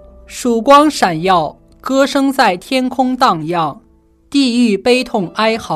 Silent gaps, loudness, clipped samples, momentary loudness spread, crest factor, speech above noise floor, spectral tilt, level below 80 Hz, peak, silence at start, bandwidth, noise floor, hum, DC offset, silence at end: none; -13 LUFS; under 0.1%; 10 LU; 14 dB; 37 dB; -4.5 dB/octave; -46 dBFS; 0 dBFS; 0.3 s; 14.5 kHz; -50 dBFS; none; under 0.1%; 0 s